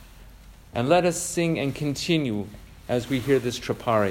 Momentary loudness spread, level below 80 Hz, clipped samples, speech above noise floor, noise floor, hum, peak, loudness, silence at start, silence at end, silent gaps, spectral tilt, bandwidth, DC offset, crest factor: 11 LU; -50 dBFS; under 0.1%; 23 dB; -47 dBFS; none; -6 dBFS; -25 LUFS; 0 s; 0 s; none; -5 dB/octave; 16 kHz; under 0.1%; 20 dB